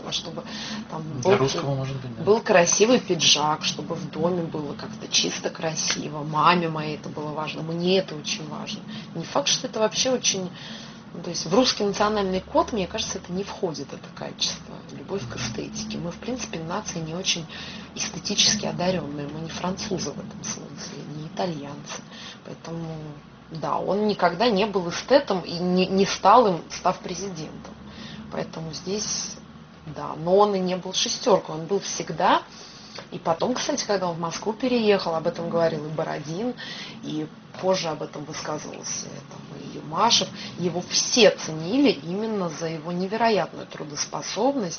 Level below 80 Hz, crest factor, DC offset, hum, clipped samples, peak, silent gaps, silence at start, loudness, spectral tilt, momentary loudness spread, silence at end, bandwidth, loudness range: -56 dBFS; 22 dB; under 0.1%; none; under 0.1%; -4 dBFS; none; 0 s; -24 LUFS; -3 dB/octave; 17 LU; 0 s; 6.8 kHz; 9 LU